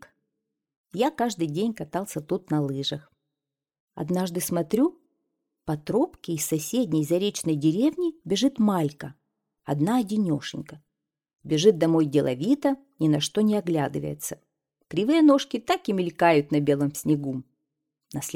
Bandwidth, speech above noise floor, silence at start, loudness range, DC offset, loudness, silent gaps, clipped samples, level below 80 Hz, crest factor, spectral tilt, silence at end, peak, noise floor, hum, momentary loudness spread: 17 kHz; 64 dB; 0.95 s; 6 LU; under 0.1%; -25 LUFS; 3.80-3.88 s; under 0.1%; -64 dBFS; 20 dB; -5.5 dB/octave; 0 s; -6 dBFS; -88 dBFS; none; 13 LU